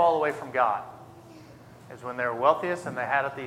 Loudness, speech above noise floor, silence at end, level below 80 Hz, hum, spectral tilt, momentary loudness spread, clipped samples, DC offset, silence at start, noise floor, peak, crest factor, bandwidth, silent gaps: -27 LUFS; 22 dB; 0 s; -68 dBFS; none; -5.5 dB/octave; 22 LU; under 0.1%; under 0.1%; 0 s; -49 dBFS; -6 dBFS; 20 dB; 15 kHz; none